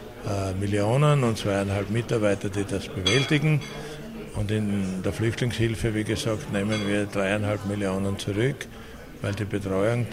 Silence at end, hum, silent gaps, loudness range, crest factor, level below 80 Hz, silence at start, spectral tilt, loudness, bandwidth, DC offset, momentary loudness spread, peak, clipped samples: 0 s; none; none; 3 LU; 16 dB; -46 dBFS; 0 s; -6 dB/octave; -26 LUFS; 16 kHz; under 0.1%; 11 LU; -10 dBFS; under 0.1%